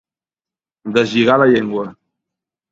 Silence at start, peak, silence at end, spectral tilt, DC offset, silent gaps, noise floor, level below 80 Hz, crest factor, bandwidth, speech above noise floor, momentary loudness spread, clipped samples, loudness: 0.85 s; 0 dBFS; 0.8 s; -6 dB/octave; under 0.1%; none; under -90 dBFS; -60 dBFS; 18 dB; 7.8 kHz; over 76 dB; 17 LU; under 0.1%; -15 LUFS